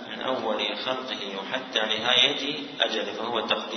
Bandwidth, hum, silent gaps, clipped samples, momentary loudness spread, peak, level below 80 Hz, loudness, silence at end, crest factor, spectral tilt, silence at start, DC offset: 6.4 kHz; none; none; under 0.1%; 11 LU; -6 dBFS; -70 dBFS; -25 LUFS; 0 s; 22 dB; -2 dB/octave; 0 s; under 0.1%